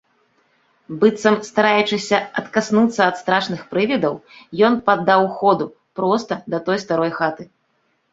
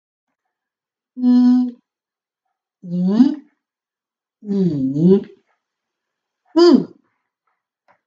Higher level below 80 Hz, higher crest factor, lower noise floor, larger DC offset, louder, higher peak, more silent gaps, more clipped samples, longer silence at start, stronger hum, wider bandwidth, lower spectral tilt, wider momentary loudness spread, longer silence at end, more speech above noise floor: about the same, -62 dBFS vs -66 dBFS; about the same, 18 dB vs 20 dB; second, -66 dBFS vs -90 dBFS; neither; about the same, -18 LUFS vs -16 LUFS; about the same, 0 dBFS vs 0 dBFS; neither; neither; second, 0.9 s vs 1.15 s; neither; about the same, 8 kHz vs 7.4 kHz; second, -5 dB/octave vs -8.5 dB/octave; second, 8 LU vs 13 LU; second, 0.7 s vs 1.2 s; second, 48 dB vs 76 dB